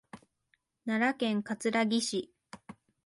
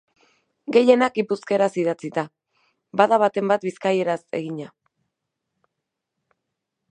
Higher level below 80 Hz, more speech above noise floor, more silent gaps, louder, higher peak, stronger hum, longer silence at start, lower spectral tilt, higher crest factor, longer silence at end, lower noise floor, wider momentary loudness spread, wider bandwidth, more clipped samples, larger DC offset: about the same, -76 dBFS vs -76 dBFS; second, 45 dB vs 62 dB; neither; second, -31 LUFS vs -21 LUFS; second, -16 dBFS vs -2 dBFS; neither; second, 0.15 s vs 0.7 s; second, -4 dB/octave vs -6 dB/octave; second, 16 dB vs 22 dB; second, 0.35 s vs 2.25 s; second, -76 dBFS vs -82 dBFS; first, 22 LU vs 15 LU; first, 11.5 kHz vs 9.6 kHz; neither; neither